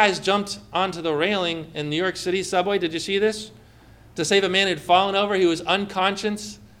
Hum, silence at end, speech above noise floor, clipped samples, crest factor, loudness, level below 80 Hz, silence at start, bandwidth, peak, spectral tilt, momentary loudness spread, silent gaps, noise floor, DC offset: none; 0.15 s; 27 dB; under 0.1%; 20 dB; -22 LUFS; -56 dBFS; 0 s; 15.5 kHz; -4 dBFS; -3.5 dB/octave; 10 LU; none; -49 dBFS; under 0.1%